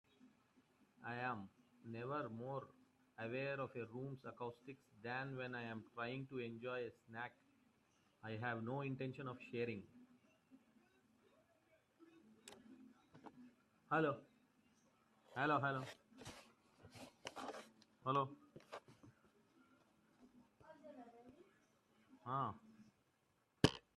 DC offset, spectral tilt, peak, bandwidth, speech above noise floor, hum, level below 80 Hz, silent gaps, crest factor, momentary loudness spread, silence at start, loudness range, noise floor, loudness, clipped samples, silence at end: under 0.1%; -6 dB/octave; -16 dBFS; 13 kHz; 36 dB; none; -78 dBFS; none; 34 dB; 23 LU; 0.2 s; 19 LU; -81 dBFS; -46 LUFS; under 0.1%; 0.15 s